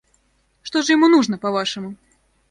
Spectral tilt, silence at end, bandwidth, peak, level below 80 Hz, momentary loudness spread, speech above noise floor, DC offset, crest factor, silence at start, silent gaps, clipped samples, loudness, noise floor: -4 dB/octave; 0.55 s; 9.8 kHz; -4 dBFS; -62 dBFS; 19 LU; 45 dB; under 0.1%; 16 dB; 0.65 s; none; under 0.1%; -18 LUFS; -63 dBFS